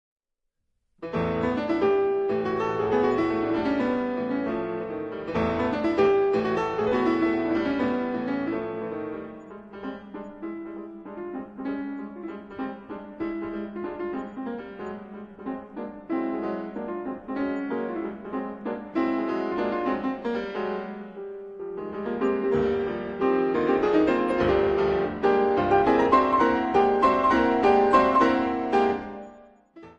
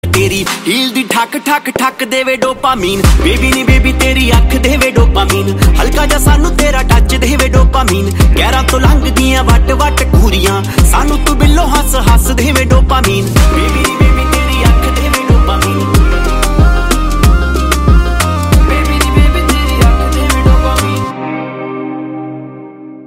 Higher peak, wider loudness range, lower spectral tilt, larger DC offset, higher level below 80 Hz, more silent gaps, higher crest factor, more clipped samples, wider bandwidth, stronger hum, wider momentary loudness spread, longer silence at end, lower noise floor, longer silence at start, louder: second, -6 dBFS vs 0 dBFS; first, 13 LU vs 2 LU; first, -7.5 dB/octave vs -5 dB/octave; second, under 0.1% vs 0.4%; second, -52 dBFS vs -12 dBFS; neither; first, 18 dB vs 8 dB; second, under 0.1% vs 0.2%; second, 7.6 kHz vs 16.5 kHz; neither; first, 17 LU vs 4 LU; about the same, 0.05 s vs 0 s; first, -79 dBFS vs -29 dBFS; first, 1 s vs 0.05 s; second, -25 LUFS vs -10 LUFS